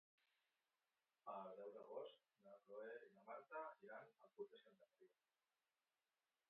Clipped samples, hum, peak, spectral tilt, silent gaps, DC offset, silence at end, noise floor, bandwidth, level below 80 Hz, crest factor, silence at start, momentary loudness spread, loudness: under 0.1%; none; -42 dBFS; -2.5 dB/octave; none; under 0.1%; 1.4 s; under -90 dBFS; 4.2 kHz; under -90 dBFS; 20 dB; 1.25 s; 7 LU; -59 LUFS